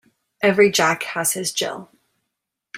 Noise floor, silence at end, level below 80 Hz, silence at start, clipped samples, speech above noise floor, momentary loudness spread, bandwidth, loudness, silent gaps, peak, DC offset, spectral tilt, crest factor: -80 dBFS; 0 s; -64 dBFS; 0.4 s; under 0.1%; 61 dB; 11 LU; 16 kHz; -19 LUFS; none; -2 dBFS; under 0.1%; -2.5 dB/octave; 18 dB